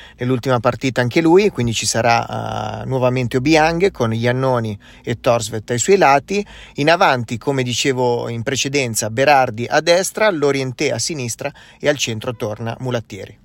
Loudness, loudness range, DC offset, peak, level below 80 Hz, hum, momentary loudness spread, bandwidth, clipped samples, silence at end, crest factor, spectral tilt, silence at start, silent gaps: -17 LUFS; 2 LU; under 0.1%; 0 dBFS; -46 dBFS; none; 11 LU; 16.5 kHz; under 0.1%; 0.1 s; 18 dB; -4.5 dB/octave; 0 s; none